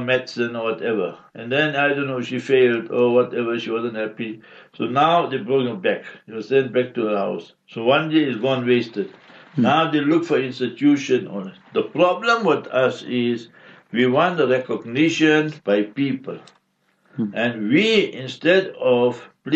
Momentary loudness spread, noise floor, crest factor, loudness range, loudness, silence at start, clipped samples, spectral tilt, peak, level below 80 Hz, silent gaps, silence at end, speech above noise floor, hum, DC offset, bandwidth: 12 LU; -65 dBFS; 16 dB; 2 LU; -20 LUFS; 0 s; under 0.1%; -6 dB/octave; -6 dBFS; -70 dBFS; none; 0 s; 45 dB; none; under 0.1%; 8 kHz